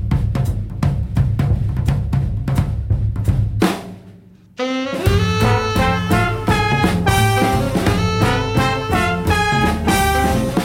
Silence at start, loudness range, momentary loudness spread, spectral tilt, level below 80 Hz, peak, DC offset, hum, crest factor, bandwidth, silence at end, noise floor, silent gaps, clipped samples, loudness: 0 s; 4 LU; 5 LU; -6 dB/octave; -26 dBFS; -2 dBFS; under 0.1%; none; 14 dB; 16.5 kHz; 0 s; -43 dBFS; none; under 0.1%; -17 LUFS